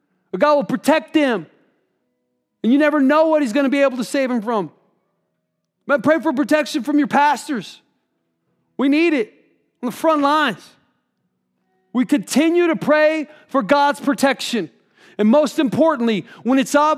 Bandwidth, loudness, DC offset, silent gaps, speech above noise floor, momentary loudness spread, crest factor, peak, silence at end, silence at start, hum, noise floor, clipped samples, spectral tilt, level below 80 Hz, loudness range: 15 kHz; -18 LUFS; under 0.1%; none; 57 dB; 11 LU; 16 dB; -2 dBFS; 0 s; 0.35 s; none; -74 dBFS; under 0.1%; -4.5 dB/octave; -72 dBFS; 3 LU